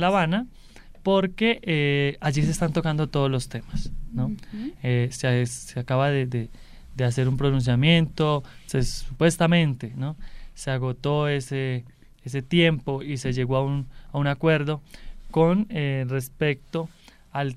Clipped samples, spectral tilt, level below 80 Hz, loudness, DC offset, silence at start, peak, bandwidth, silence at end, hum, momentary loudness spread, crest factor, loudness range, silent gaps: under 0.1%; -6 dB/octave; -40 dBFS; -25 LUFS; under 0.1%; 0 s; -6 dBFS; 14 kHz; 0 s; none; 13 LU; 18 dB; 3 LU; none